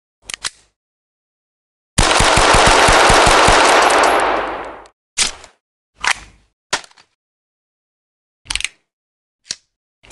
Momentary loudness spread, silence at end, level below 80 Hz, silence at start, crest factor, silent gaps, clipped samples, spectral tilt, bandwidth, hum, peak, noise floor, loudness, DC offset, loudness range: 19 LU; 0.55 s; -30 dBFS; 0.45 s; 16 dB; 0.76-1.96 s, 4.93-5.17 s, 5.61-5.93 s, 6.53-6.70 s, 7.15-8.45 s, 8.93-9.39 s; under 0.1%; -2 dB/octave; 12.5 kHz; none; 0 dBFS; under -90 dBFS; -12 LUFS; under 0.1%; 17 LU